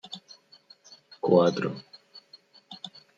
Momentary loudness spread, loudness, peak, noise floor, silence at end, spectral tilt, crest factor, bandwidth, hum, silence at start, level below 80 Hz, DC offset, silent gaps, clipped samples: 27 LU; -25 LUFS; -6 dBFS; -57 dBFS; 0.3 s; -6.5 dB/octave; 24 dB; 7.8 kHz; none; 0.1 s; -76 dBFS; under 0.1%; none; under 0.1%